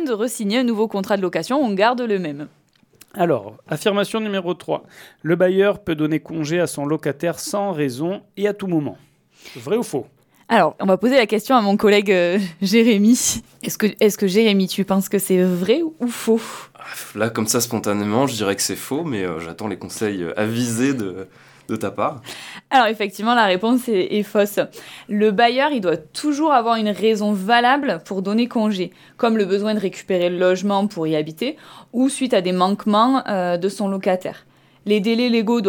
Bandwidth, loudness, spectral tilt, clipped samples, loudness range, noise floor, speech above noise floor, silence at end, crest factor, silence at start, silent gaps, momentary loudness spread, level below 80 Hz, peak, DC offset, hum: 19 kHz; -19 LUFS; -4.5 dB/octave; under 0.1%; 6 LU; -52 dBFS; 33 dB; 0 s; 16 dB; 0 s; none; 12 LU; -62 dBFS; -2 dBFS; under 0.1%; none